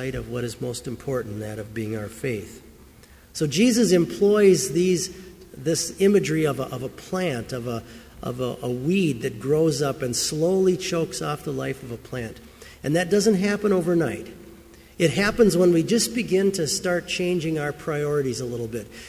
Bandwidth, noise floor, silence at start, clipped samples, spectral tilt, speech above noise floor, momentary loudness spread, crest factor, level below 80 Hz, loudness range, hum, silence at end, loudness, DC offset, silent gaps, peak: 16 kHz; -49 dBFS; 0 s; under 0.1%; -5 dB/octave; 27 dB; 14 LU; 18 dB; -50 dBFS; 5 LU; none; 0 s; -23 LUFS; under 0.1%; none; -6 dBFS